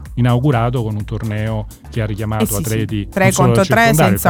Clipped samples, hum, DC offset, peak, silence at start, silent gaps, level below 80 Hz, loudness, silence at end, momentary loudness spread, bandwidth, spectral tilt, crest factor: under 0.1%; none; under 0.1%; 0 dBFS; 0 s; none; -32 dBFS; -16 LUFS; 0 s; 11 LU; over 20 kHz; -5.5 dB/octave; 14 dB